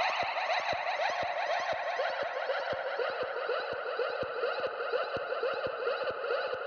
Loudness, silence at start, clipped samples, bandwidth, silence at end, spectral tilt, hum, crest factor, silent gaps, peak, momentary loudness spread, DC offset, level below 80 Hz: -33 LUFS; 0 s; under 0.1%; 6.8 kHz; 0 s; -2.5 dB/octave; none; 16 dB; none; -18 dBFS; 3 LU; under 0.1%; -72 dBFS